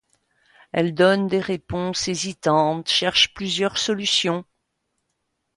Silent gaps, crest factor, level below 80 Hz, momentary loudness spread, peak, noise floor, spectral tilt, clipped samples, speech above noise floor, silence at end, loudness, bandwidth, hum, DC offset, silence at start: none; 20 dB; -54 dBFS; 8 LU; -4 dBFS; -75 dBFS; -3.5 dB/octave; under 0.1%; 54 dB; 1.15 s; -21 LUFS; 11.5 kHz; none; under 0.1%; 0.75 s